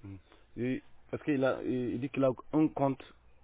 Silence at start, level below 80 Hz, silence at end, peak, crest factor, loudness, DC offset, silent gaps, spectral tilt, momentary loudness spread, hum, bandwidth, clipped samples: 0.05 s; -62 dBFS; 0.35 s; -16 dBFS; 18 dB; -33 LUFS; under 0.1%; none; -7 dB/octave; 14 LU; none; 4 kHz; under 0.1%